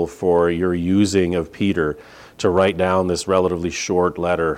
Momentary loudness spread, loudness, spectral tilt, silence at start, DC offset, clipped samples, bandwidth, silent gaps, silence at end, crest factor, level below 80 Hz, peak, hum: 5 LU; -19 LUFS; -5.5 dB/octave; 0 s; under 0.1%; under 0.1%; 15 kHz; none; 0 s; 16 dB; -44 dBFS; -4 dBFS; none